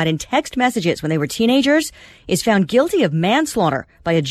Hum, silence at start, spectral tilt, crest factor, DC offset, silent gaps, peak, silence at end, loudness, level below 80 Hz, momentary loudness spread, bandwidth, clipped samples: none; 0 s; -5 dB/octave; 14 dB; under 0.1%; none; -4 dBFS; 0 s; -18 LUFS; -48 dBFS; 6 LU; 14 kHz; under 0.1%